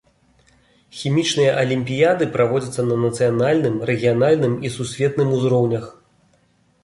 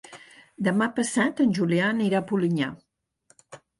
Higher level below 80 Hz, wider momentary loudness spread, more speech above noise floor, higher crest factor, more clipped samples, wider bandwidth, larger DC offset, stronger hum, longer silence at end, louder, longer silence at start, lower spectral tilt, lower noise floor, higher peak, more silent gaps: first, -56 dBFS vs -68 dBFS; about the same, 7 LU vs 6 LU; about the same, 42 dB vs 41 dB; about the same, 16 dB vs 16 dB; neither; about the same, 11.5 kHz vs 11.5 kHz; neither; neither; first, 0.9 s vs 0.25 s; first, -19 LUFS vs -24 LUFS; first, 0.95 s vs 0.1 s; about the same, -6 dB/octave vs -5.5 dB/octave; second, -60 dBFS vs -64 dBFS; first, -4 dBFS vs -10 dBFS; neither